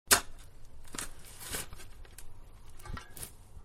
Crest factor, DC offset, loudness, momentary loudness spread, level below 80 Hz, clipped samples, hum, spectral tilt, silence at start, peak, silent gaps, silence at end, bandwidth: 32 dB; under 0.1%; -36 LUFS; 22 LU; -48 dBFS; under 0.1%; none; -0.5 dB/octave; 0.05 s; -6 dBFS; none; 0 s; 16 kHz